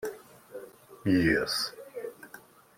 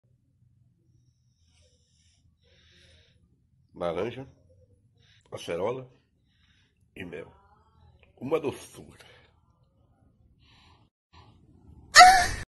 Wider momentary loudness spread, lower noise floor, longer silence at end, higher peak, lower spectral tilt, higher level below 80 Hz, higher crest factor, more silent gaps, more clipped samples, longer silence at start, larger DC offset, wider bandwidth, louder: second, 25 LU vs 30 LU; second, -53 dBFS vs -67 dBFS; first, 0.4 s vs 0.05 s; second, -12 dBFS vs 0 dBFS; first, -4.5 dB/octave vs -1.5 dB/octave; about the same, -56 dBFS vs -52 dBFS; second, 20 dB vs 28 dB; second, none vs 10.91-11.10 s; neither; second, 0 s vs 3.8 s; neither; first, 16.5 kHz vs 12 kHz; second, -28 LUFS vs -21 LUFS